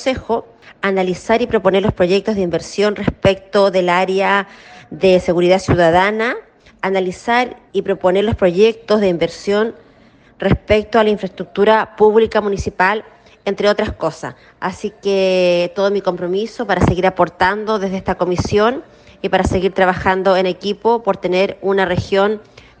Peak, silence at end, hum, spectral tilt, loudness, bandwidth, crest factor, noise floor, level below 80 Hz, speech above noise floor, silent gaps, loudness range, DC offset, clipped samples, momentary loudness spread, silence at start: 0 dBFS; 0.4 s; none; -6 dB/octave; -16 LUFS; 9.2 kHz; 16 dB; -48 dBFS; -38 dBFS; 32 dB; none; 2 LU; under 0.1%; under 0.1%; 9 LU; 0 s